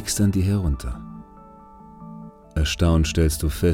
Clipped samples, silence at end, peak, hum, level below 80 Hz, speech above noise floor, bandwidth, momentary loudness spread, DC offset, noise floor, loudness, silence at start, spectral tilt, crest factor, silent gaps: under 0.1%; 0 s; -6 dBFS; none; -32 dBFS; 25 dB; 16.5 kHz; 21 LU; under 0.1%; -45 dBFS; -22 LUFS; 0 s; -5.5 dB/octave; 16 dB; none